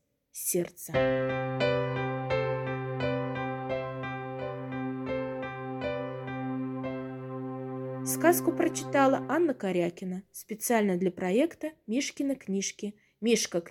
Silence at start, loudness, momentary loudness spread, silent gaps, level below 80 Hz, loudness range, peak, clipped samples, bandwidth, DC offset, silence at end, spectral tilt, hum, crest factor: 0.35 s; -30 LUFS; 11 LU; none; -62 dBFS; 7 LU; -10 dBFS; under 0.1%; 18.5 kHz; under 0.1%; 0 s; -5 dB/octave; none; 22 dB